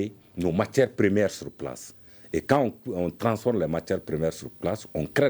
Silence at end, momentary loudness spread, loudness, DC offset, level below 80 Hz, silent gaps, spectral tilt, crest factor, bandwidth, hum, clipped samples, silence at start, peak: 0 s; 13 LU; -27 LUFS; under 0.1%; -54 dBFS; none; -6.5 dB/octave; 20 dB; over 20 kHz; none; under 0.1%; 0 s; -6 dBFS